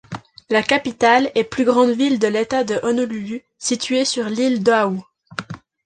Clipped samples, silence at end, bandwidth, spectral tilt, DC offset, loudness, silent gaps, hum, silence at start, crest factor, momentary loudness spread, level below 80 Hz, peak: under 0.1%; 0.3 s; 9.8 kHz; -4 dB/octave; under 0.1%; -18 LUFS; none; none; 0.1 s; 18 dB; 16 LU; -58 dBFS; -2 dBFS